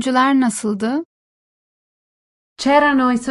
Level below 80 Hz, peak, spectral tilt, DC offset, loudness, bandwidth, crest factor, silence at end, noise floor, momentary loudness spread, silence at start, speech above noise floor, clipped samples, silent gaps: -58 dBFS; -2 dBFS; -4 dB/octave; under 0.1%; -17 LUFS; 11.5 kHz; 16 dB; 0 s; under -90 dBFS; 9 LU; 0 s; over 74 dB; under 0.1%; 1.05-2.56 s